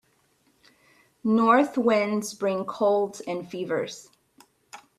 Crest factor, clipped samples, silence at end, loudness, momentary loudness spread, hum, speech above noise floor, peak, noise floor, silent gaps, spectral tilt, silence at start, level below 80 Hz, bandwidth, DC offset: 18 dB; under 0.1%; 0.2 s; -25 LUFS; 13 LU; none; 42 dB; -8 dBFS; -66 dBFS; none; -5 dB/octave; 1.25 s; -72 dBFS; 13.5 kHz; under 0.1%